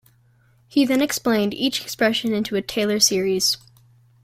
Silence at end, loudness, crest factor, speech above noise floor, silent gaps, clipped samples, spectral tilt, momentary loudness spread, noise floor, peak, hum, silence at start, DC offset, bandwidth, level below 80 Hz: 0.65 s; -20 LUFS; 20 dB; 37 dB; none; under 0.1%; -3 dB/octave; 6 LU; -57 dBFS; -2 dBFS; none; 0.75 s; under 0.1%; 16.5 kHz; -60 dBFS